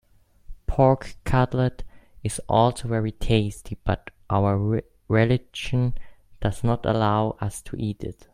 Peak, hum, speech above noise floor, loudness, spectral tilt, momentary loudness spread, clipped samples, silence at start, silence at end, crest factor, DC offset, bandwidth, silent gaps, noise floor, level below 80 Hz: -4 dBFS; none; 19 dB; -24 LUFS; -6.5 dB/octave; 10 LU; under 0.1%; 0.5 s; 0.1 s; 20 dB; under 0.1%; 14 kHz; none; -42 dBFS; -38 dBFS